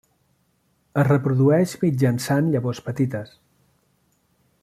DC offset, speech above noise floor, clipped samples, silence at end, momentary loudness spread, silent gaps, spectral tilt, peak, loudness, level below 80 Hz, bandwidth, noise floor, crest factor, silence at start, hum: under 0.1%; 46 dB; under 0.1%; 1.35 s; 10 LU; none; -7.5 dB/octave; -4 dBFS; -21 LUFS; -60 dBFS; 14.5 kHz; -66 dBFS; 18 dB; 0.95 s; none